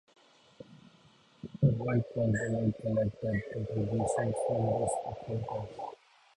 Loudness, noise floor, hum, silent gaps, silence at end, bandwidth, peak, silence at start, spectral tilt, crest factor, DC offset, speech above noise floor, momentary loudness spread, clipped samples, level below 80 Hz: -32 LUFS; -62 dBFS; none; none; 0.4 s; 11 kHz; -14 dBFS; 0.6 s; -7.5 dB/octave; 20 dB; under 0.1%; 31 dB; 14 LU; under 0.1%; -56 dBFS